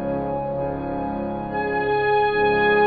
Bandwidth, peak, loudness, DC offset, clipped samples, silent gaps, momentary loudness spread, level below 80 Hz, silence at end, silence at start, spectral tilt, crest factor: 4.9 kHz; -8 dBFS; -22 LUFS; 0.1%; under 0.1%; none; 8 LU; -44 dBFS; 0 s; 0 s; -9 dB/octave; 14 dB